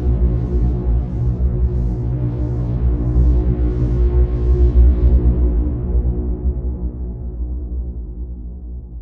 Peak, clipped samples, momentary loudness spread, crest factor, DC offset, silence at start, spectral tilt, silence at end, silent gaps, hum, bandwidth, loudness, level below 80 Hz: -2 dBFS; under 0.1%; 13 LU; 14 dB; under 0.1%; 0 s; -12 dB/octave; 0 s; none; none; 2.1 kHz; -19 LUFS; -18 dBFS